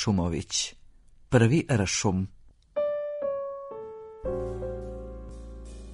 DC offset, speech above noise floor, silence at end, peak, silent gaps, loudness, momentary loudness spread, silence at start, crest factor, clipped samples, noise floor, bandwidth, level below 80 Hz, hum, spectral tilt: under 0.1%; 28 dB; 0 s; -4 dBFS; none; -28 LUFS; 19 LU; 0 s; 24 dB; under 0.1%; -53 dBFS; 10.5 kHz; -46 dBFS; none; -5 dB/octave